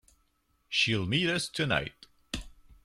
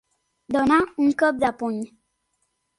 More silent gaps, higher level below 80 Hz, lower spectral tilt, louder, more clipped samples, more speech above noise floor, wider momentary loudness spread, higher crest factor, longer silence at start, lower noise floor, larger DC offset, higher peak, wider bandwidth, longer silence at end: neither; about the same, -52 dBFS vs -56 dBFS; second, -4 dB/octave vs -5.5 dB/octave; second, -28 LUFS vs -22 LUFS; neither; second, 42 dB vs 52 dB; first, 14 LU vs 11 LU; about the same, 20 dB vs 18 dB; first, 0.7 s vs 0.5 s; about the same, -72 dBFS vs -73 dBFS; neither; second, -14 dBFS vs -6 dBFS; first, 14.5 kHz vs 11.5 kHz; second, 0.35 s vs 0.9 s